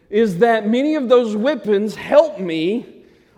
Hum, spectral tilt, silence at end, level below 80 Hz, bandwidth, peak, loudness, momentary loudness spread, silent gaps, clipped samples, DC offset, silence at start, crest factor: none; -6.5 dB/octave; 0.45 s; -60 dBFS; 12.5 kHz; 0 dBFS; -17 LUFS; 6 LU; none; under 0.1%; under 0.1%; 0.1 s; 16 dB